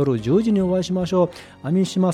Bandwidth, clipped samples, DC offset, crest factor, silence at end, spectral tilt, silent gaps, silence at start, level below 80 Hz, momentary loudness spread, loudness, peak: 11 kHz; under 0.1%; under 0.1%; 12 dB; 0 s; -7.5 dB/octave; none; 0 s; -48 dBFS; 5 LU; -20 LUFS; -6 dBFS